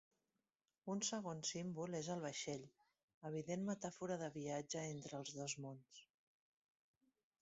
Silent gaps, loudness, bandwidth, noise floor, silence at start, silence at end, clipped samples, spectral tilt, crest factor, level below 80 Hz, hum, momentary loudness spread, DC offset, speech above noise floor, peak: 3.03-3.08 s, 3.14-3.21 s; -47 LUFS; 8 kHz; under -90 dBFS; 0.85 s; 1.35 s; under 0.1%; -5 dB/octave; 20 dB; -84 dBFS; none; 12 LU; under 0.1%; over 43 dB; -28 dBFS